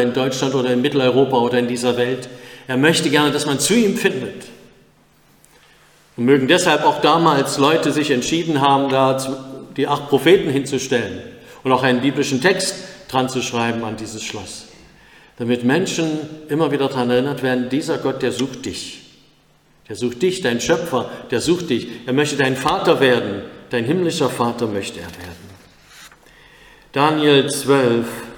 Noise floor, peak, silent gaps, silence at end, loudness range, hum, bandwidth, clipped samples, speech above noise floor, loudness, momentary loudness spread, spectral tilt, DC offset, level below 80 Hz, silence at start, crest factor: -55 dBFS; 0 dBFS; none; 0 s; 6 LU; none; 19 kHz; under 0.1%; 37 dB; -18 LUFS; 14 LU; -4.5 dB/octave; under 0.1%; -56 dBFS; 0 s; 18 dB